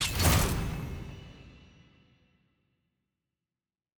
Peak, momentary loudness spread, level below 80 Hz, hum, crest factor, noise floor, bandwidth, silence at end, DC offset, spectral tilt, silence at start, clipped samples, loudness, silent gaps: -14 dBFS; 23 LU; -40 dBFS; none; 20 dB; under -90 dBFS; over 20 kHz; 2.4 s; under 0.1%; -4 dB/octave; 0 s; under 0.1%; -29 LUFS; none